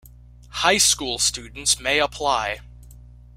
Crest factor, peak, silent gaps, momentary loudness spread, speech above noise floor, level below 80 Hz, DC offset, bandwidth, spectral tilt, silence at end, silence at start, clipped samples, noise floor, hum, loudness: 22 dB; -2 dBFS; none; 11 LU; 24 dB; -44 dBFS; under 0.1%; 16 kHz; -0.5 dB/octave; 0.3 s; 0.05 s; under 0.1%; -46 dBFS; 60 Hz at -40 dBFS; -20 LUFS